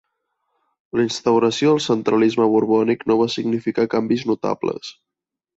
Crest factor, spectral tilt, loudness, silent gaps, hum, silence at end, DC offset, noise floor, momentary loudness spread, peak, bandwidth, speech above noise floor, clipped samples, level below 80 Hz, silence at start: 14 dB; -5.5 dB/octave; -19 LUFS; none; none; 0.65 s; under 0.1%; -74 dBFS; 8 LU; -6 dBFS; 8 kHz; 55 dB; under 0.1%; -62 dBFS; 0.95 s